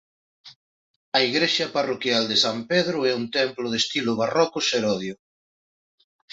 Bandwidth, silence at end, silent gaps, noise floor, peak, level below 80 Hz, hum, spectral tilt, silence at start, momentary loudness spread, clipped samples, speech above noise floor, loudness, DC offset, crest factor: 8 kHz; 1.2 s; 0.56-1.12 s; under -90 dBFS; -4 dBFS; -68 dBFS; none; -3.5 dB/octave; 0.45 s; 5 LU; under 0.1%; over 67 dB; -22 LUFS; under 0.1%; 22 dB